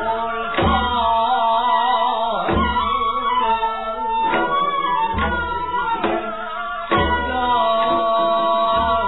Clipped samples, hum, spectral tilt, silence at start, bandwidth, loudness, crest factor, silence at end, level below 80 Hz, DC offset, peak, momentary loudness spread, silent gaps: under 0.1%; none; -8.5 dB/octave; 0 s; 4.1 kHz; -19 LUFS; 14 dB; 0 s; -36 dBFS; 1%; -4 dBFS; 5 LU; none